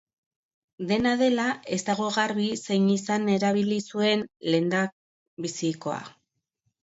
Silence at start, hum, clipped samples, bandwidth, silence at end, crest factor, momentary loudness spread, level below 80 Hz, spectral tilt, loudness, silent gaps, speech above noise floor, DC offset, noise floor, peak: 0.8 s; none; under 0.1%; 8 kHz; 0.7 s; 18 dB; 9 LU; -66 dBFS; -5 dB/octave; -26 LUFS; 4.92-5.37 s; 52 dB; under 0.1%; -77 dBFS; -10 dBFS